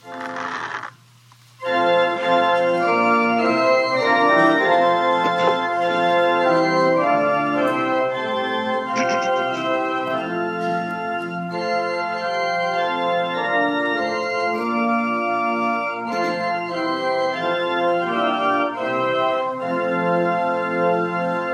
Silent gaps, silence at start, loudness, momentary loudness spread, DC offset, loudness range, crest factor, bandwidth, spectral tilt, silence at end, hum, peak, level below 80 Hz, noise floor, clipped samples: none; 0.05 s; -20 LUFS; 7 LU; under 0.1%; 5 LU; 16 dB; 11 kHz; -5 dB/octave; 0 s; none; -4 dBFS; -72 dBFS; -50 dBFS; under 0.1%